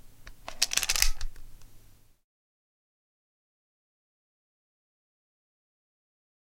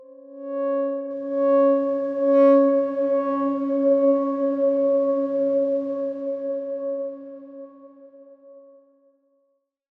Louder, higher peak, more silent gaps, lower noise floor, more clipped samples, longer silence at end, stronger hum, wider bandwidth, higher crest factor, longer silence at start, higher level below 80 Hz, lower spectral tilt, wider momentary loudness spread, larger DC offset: second, -27 LUFS vs -22 LUFS; about the same, -6 dBFS vs -6 dBFS; neither; second, -54 dBFS vs -71 dBFS; neither; first, 4.7 s vs 1.4 s; neither; first, 16.5 kHz vs 3.8 kHz; first, 30 dB vs 16 dB; about the same, 0.05 s vs 0 s; first, -42 dBFS vs -78 dBFS; second, 1 dB/octave vs -8.5 dB/octave; first, 21 LU vs 14 LU; neither